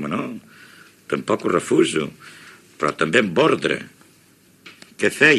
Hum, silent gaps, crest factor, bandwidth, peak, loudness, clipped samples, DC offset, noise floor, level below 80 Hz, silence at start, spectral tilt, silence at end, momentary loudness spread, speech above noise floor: none; none; 22 dB; 13.5 kHz; 0 dBFS; -20 LUFS; under 0.1%; under 0.1%; -54 dBFS; -62 dBFS; 0 s; -4.5 dB/octave; 0 s; 22 LU; 34 dB